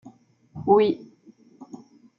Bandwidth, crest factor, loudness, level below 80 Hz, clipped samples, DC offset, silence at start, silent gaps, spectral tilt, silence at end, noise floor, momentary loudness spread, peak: 6.8 kHz; 20 dB; -22 LUFS; -68 dBFS; under 0.1%; under 0.1%; 0.55 s; none; -8 dB/octave; 0.55 s; -54 dBFS; 25 LU; -6 dBFS